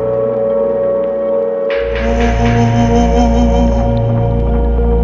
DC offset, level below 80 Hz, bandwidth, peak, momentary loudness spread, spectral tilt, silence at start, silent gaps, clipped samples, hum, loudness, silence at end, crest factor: under 0.1%; -18 dBFS; 7.2 kHz; 0 dBFS; 4 LU; -7.5 dB/octave; 0 s; none; under 0.1%; none; -13 LUFS; 0 s; 12 dB